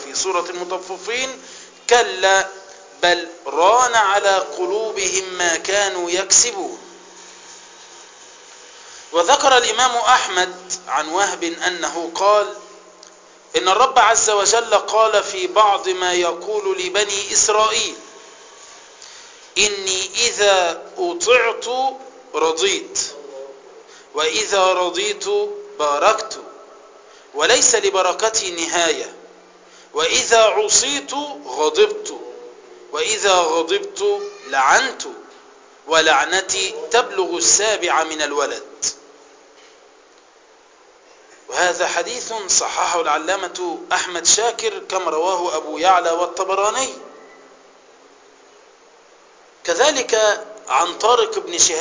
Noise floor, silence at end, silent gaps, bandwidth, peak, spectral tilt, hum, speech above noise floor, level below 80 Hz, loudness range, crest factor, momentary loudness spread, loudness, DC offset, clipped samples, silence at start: -50 dBFS; 0 s; none; 7.8 kHz; 0 dBFS; 0 dB/octave; none; 32 dB; -60 dBFS; 5 LU; 18 dB; 14 LU; -17 LUFS; under 0.1%; under 0.1%; 0 s